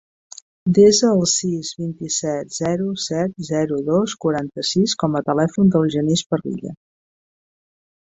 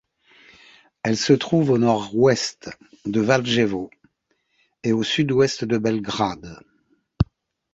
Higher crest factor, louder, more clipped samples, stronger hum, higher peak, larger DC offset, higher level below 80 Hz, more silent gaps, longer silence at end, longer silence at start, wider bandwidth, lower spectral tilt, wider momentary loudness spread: about the same, 18 dB vs 20 dB; about the same, -19 LUFS vs -21 LUFS; neither; neither; about the same, -2 dBFS vs -2 dBFS; neither; second, -56 dBFS vs -46 dBFS; first, 6.26-6.30 s vs none; first, 1.35 s vs 0.5 s; second, 0.65 s vs 1.05 s; about the same, 8.2 kHz vs 8.2 kHz; about the same, -5 dB/octave vs -5.5 dB/octave; second, 11 LU vs 14 LU